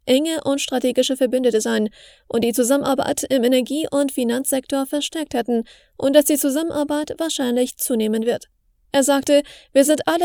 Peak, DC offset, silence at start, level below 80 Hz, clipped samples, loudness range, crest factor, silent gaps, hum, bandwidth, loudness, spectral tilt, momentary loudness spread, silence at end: 0 dBFS; under 0.1%; 0.05 s; -58 dBFS; under 0.1%; 1 LU; 20 dB; none; none; 20 kHz; -20 LUFS; -3 dB/octave; 7 LU; 0 s